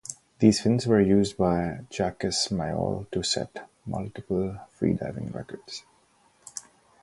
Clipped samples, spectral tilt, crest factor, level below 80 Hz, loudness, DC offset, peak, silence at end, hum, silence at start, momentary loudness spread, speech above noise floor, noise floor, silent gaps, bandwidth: under 0.1%; -5.5 dB/octave; 22 dB; -50 dBFS; -26 LUFS; under 0.1%; -4 dBFS; 0.4 s; none; 0.1 s; 19 LU; 37 dB; -63 dBFS; none; 11.5 kHz